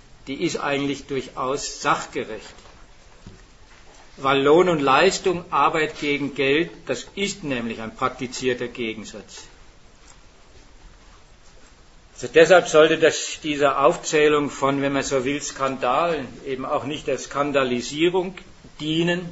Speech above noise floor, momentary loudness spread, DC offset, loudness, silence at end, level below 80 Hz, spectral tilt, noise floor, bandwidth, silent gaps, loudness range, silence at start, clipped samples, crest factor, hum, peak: 28 dB; 14 LU; under 0.1%; -21 LUFS; 0 s; -50 dBFS; -4 dB/octave; -49 dBFS; 8 kHz; none; 11 LU; 0.25 s; under 0.1%; 22 dB; none; 0 dBFS